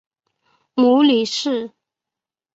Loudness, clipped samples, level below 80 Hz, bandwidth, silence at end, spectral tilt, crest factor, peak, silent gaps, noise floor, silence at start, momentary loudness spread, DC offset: -17 LUFS; under 0.1%; -68 dBFS; 8 kHz; 0.85 s; -4 dB/octave; 14 dB; -6 dBFS; none; -88 dBFS; 0.75 s; 13 LU; under 0.1%